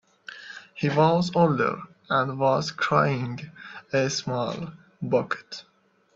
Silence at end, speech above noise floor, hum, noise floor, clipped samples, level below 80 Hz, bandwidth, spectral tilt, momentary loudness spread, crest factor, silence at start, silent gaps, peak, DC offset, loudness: 0.55 s; 19 dB; none; -44 dBFS; under 0.1%; -64 dBFS; 7.8 kHz; -5.5 dB/octave; 19 LU; 20 dB; 0.3 s; none; -6 dBFS; under 0.1%; -25 LUFS